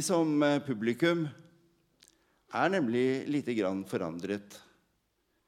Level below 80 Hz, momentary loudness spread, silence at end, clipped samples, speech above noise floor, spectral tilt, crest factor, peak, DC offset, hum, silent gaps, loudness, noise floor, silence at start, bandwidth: -80 dBFS; 10 LU; 0.9 s; under 0.1%; 46 dB; -5.5 dB/octave; 20 dB; -12 dBFS; under 0.1%; none; none; -31 LUFS; -76 dBFS; 0 s; 15 kHz